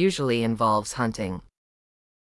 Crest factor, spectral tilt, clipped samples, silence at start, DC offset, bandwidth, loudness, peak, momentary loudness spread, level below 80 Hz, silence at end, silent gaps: 16 dB; -5.5 dB/octave; under 0.1%; 0 s; under 0.1%; 12 kHz; -25 LUFS; -10 dBFS; 10 LU; -54 dBFS; 0.8 s; none